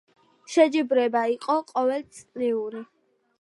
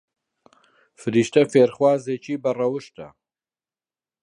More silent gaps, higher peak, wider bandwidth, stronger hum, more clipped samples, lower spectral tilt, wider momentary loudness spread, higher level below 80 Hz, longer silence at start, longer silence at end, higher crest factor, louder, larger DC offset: neither; second, -6 dBFS vs -2 dBFS; about the same, 11.5 kHz vs 10.5 kHz; neither; neither; second, -4 dB/octave vs -6 dB/octave; about the same, 14 LU vs 15 LU; second, -78 dBFS vs -68 dBFS; second, 0.5 s vs 1 s; second, 0.55 s vs 1.15 s; about the same, 20 dB vs 20 dB; second, -24 LUFS vs -21 LUFS; neither